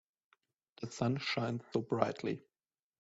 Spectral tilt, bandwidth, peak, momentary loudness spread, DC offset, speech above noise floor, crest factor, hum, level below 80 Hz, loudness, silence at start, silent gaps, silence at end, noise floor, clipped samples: -5 dB/octave; 8 kHz; -12 dBFS; 12 LU; under 0.1%; over 54 dB; 26 dB; none; -74 dBFS; -37 LUFS; 0.8 s; none; 0.6 s; under -90 dBFS; under 0.1%